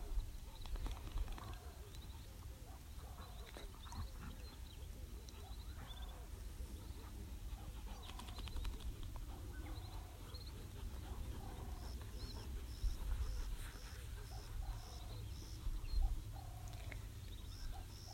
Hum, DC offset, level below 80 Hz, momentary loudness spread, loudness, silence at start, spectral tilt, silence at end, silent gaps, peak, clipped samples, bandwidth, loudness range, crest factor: none; under 0.1%; -48 dBFS; 7 LU; -51 LUFS; 0 s; -5 dB/octave; 0 s; none; -26 dBFS; under 0.1%; 16 kHz; 4 LU; 20 dB